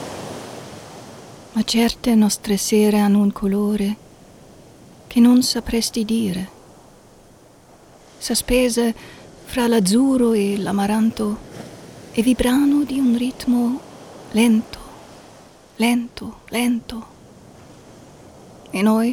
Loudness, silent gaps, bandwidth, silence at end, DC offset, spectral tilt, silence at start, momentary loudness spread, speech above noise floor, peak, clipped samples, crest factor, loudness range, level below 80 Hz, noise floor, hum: -19 LUFS; none; 18.5 kHz; 0 s; under 0.1%; -4.5 dB/octave; 0 s; 21 LU; 30 dB; -4 dBFS; under 0.1%; 16 dB; 6 LU; -44 dBFS; -48 dBFS; none